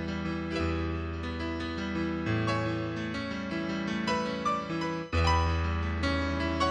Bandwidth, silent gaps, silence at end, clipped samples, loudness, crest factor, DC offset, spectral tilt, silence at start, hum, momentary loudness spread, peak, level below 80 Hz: 9.4 kHz; none; 0 s; under 0.1%; -31 LUFS; 18 dB; under 0.1%; -6 dB/octave; 0 s; none; 6 LU; -14 dBFS; -40 dBFS